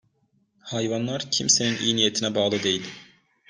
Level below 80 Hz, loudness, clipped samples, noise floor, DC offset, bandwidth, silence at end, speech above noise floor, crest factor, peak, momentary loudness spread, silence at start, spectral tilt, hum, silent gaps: -64 dBFS; -23 LUFS; under 0.1%; -68 dBFS; under 0.1%; 10.5 kHz; 0.45 s; 43 dB; 22 dB; -4 dBFS; 9 LU; 0.65 s; -2.5 dB/octave; none; none